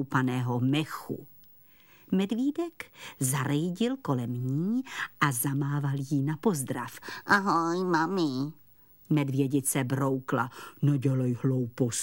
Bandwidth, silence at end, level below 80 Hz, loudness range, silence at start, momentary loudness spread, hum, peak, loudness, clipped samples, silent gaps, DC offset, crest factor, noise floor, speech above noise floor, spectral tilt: 16.5 kHz; 0 s; -72 dBFS; 3 LU; 0 s; 9 LU; none; -8 dBFS; -29 LUFS; under 0.1%; none; 0.1%; 20 dB; -58 dBFS; 29 dB; -5.5 dB/octave